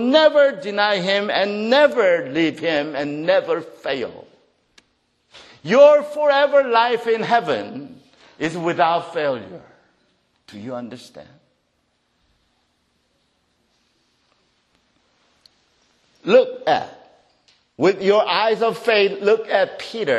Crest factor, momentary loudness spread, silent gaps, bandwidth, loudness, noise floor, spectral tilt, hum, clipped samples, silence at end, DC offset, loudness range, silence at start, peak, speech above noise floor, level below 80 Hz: 20 dB; 17 LU; none; 10 kHz; -18 LUFS; -68 dBFS; -5 dB/octave; none; under 0.1%; 0 s; under 0.1%; 20 LU; 0 s; 0 dBFS; 50 dB; -68 dBFS